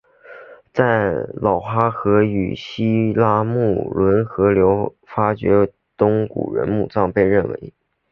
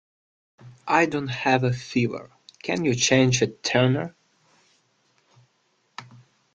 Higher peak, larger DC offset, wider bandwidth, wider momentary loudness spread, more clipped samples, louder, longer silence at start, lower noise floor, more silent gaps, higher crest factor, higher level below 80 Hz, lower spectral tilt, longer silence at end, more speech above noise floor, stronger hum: first, 0 dBFS vs -4 dBFS; neither; second, 6.4 kHz vs 9.2 kHz; second, 7 LU vs 22 LU; neither; first, -18 LUFS vs -22 LUFS; second, 0.3 s vs 0.65 s; second, -41 dBFS vs -68 dBFS; neither; about the same, 18 dB vs 22 dB; first, -44 dBFS vs -60 dBFS; first, -9.5 dB/octave vs -4.5 dB/octave; about the same, 0.45 s vs 0.5 s; second, 24 dB vs 46 dB; neither